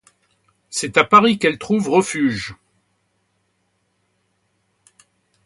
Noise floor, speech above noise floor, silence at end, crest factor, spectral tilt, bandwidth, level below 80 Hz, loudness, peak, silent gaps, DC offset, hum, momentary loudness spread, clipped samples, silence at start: -68 dBFS; 51 dB; 2.95 s; 20 dB; -4 dB/octave; 11.5 kHz; -58 dBFS; -17 LUFS; 0 dBFS; none; under 0.1%; none; 15 LU; under 0.1%; 0.7 s